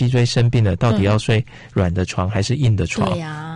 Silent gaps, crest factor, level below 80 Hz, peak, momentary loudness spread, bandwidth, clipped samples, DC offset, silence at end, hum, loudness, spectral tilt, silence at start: none; 10 dB; -38 dBFS; -6 dBFS; 5 LU; 10.5 kHz; under 0.1%; under 0.1%; 0 s; none; -18 LUFS; -6.5 dB/octave; 0 s